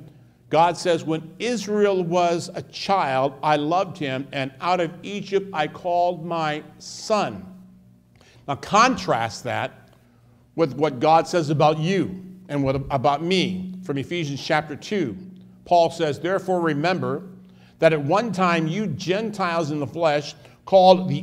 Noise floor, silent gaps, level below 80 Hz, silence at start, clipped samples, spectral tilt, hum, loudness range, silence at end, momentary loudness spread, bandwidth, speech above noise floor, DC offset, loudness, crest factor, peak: -55 dBFS; none; -58 dBFS; 0 s; under 0.1%; -5.5 dB/octave; none; 3 LU; 0 s; 12 LU; 15 kHz; 33 dB; under 0.1%; -22 LUFS; 20 dB; -2 dBFS